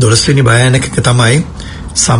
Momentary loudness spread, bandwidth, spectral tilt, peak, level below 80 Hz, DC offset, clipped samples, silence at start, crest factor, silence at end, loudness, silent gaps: 11 LU; 11 kHz; -4 dB/octave; 0 dBFS; -30 dBFS; under 0.1%; 0.3%; 0 s; 10 dB; 0 s; -9 LUFS; none